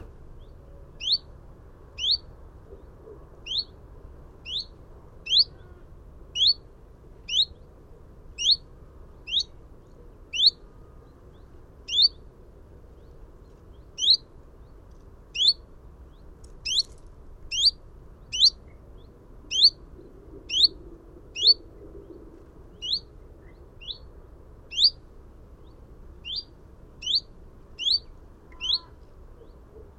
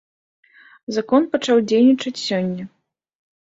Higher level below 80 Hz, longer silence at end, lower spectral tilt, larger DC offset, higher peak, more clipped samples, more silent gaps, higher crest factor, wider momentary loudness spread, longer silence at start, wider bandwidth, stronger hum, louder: first, -48 dBFS vs -66 dBFS; second, 0.15 s vs 0.9 s; second, -0.5 dB/octave vs -5.5 dB/octave; neither; second, -6 dBFS vs -2 dBFS; neither; neither; first, 24 dB vs 18 dB; first, 21 LU vs 16 LU; second, 0 s vs 0.9 s; first, 13 kHz vs 7.8 kHz; neither; second, -23 LUFS vs -18 LUFS